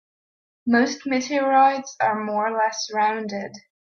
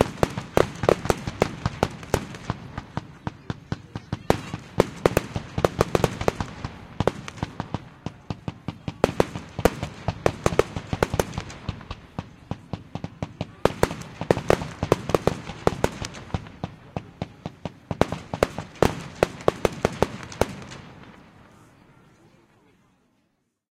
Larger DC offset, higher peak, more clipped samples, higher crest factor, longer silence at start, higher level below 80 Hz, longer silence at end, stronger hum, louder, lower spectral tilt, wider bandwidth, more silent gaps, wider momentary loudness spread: neither; second, -6 dBFS vs 0 dBFS; neither; second, 16 dB vs 28 dB; first, 0.65 s vs 0 s; second, -72 dBFS vs -42 dBFS; second, 0.35 s vs 2.5 s; neither; first, -22 LUFS vs -27 LUFS; second, -3.5 dB/octave vs -5.5 dB/octave; second, 7.2 kHz vs 16.5 kHz; neither; about the same, 13 LU vs 14 LU